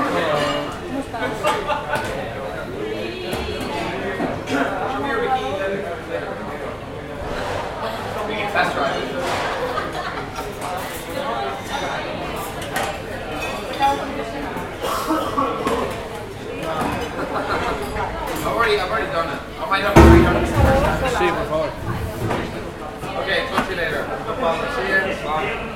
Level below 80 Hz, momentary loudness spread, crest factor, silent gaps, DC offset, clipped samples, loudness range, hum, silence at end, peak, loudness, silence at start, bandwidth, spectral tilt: -32 dBFS; 10 LU; 22 dB; none; under 0.1%; under 0.1%; 8 LU; none; 0 s; 0 dBFS; -22 LUFS; 0 s; 16.5 kHz; -5.5 dB/octave